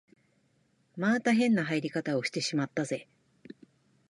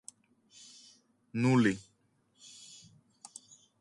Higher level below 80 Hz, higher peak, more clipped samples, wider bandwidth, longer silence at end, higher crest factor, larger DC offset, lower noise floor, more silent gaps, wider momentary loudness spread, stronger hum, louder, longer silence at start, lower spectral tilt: second, -78 dBFS vs -72 dBFS; about the same, -14 dBFS vs -14 dBFS; neither; about the same, 11 kHz vs 11.5 kHz; second, 1.05 s vs 2 s; about the same, 18 dB vs 20 dB; neither; about the same, -70 dBFS vs -72 dBFS; neither; second, 10 LU vs 28 LU; neither; about the same, -29 LUFS vs -30 LUFS; second, 0.95 s vs 1.35 s; about the same, -5 dB/octave vs -6 dB/octave